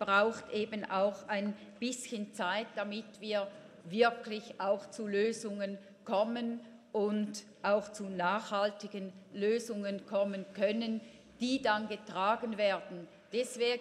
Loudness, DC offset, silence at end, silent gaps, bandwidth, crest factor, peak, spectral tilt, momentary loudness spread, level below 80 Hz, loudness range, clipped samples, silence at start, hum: -35 LUFS; under 0.1%; 0 s; none; 13.5 kHz; 20 dB; -14 dBFS; -4.5 dB/octave; 10 LU; -78 dBFS; 2 LU; under 0.1%; 0 s; none